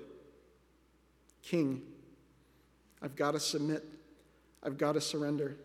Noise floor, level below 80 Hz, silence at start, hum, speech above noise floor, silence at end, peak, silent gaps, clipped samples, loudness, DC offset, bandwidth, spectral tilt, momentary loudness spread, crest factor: -68 dBFS; -72 dBFS; 0 s; none; 34 dB; 0 s; -18 dBFS; none; under 0.1%; -35 LUFS; under 0.1%; 16 kHz; -4.5 dB/octave; 22 LU; 20 dB